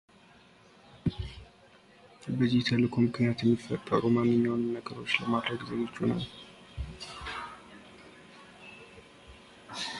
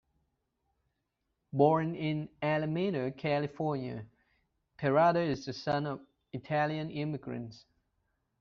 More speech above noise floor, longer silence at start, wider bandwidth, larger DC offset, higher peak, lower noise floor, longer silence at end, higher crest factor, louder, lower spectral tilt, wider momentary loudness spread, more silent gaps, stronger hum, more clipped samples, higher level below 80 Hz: second, 30 dB vs 51 dB; second, 0.95 s vs 1.55 s; first, 11.5 kHz vs 6.8 kHz; neither; about the same, -10 dBFS vs -12 dBFS; second, -58 dBFS vs -83 dBFS; second, 0 s vs 0.8 s; about the same, 22 dB vs 22 dB; about the same, -30 LUFS vs -32 LUFS; about the same, -6.5 dB/octave vs -5.5 dB/octave; first, 25 LU vs 15 LU; neither; neither; neither; first, -54 dBFS vs -68 dBFS